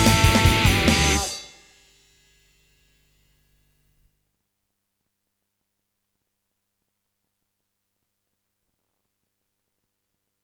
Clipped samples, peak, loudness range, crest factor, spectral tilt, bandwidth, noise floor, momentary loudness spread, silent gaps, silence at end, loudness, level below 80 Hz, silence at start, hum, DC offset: under 0.1%; -2 dBFS; 15 LU; 24 dB; -4 dB/octave; 18.5 kHz; -79 dBFS; 11 LU; none; 9 s; -18 LUFS; -36 dBFS; 0 s; none; under 0.1%